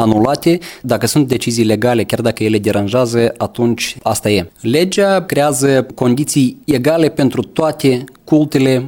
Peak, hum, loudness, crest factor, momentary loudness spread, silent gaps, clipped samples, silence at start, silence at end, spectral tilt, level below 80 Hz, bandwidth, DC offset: 0 dBFS; none; -14 LUFS; 14 dB; 4 LU; none; under 0.1%; 0 s; 0 s; -5.5 dB/octave; -48 dBFS; 18 kHz; under 0.1%